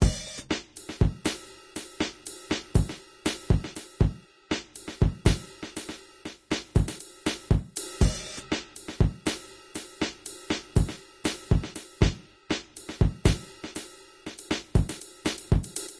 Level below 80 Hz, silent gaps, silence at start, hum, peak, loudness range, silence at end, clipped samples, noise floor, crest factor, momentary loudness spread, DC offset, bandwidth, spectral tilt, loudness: -34 dBFS; none; 0 s; none; -8 dBFS; 2 LU; 0 s; under 0.1%; -45 dBFS; 20 dB; 14 LU; under 0.1%; 11 kHz; -5 dB/octave; -30 LUFS